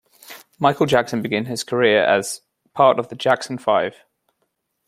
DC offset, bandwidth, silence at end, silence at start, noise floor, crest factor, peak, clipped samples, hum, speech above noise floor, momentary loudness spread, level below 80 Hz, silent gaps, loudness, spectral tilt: under 0.1%; 16 kHz; 0.95 s; 0.3 s; -72 dBFS; 18 dB; -2 dBFS; under 0.1%; none; 54 dB; 14 LU; -62 dBFS; none; -19 LUFS; -4.5 dB/octave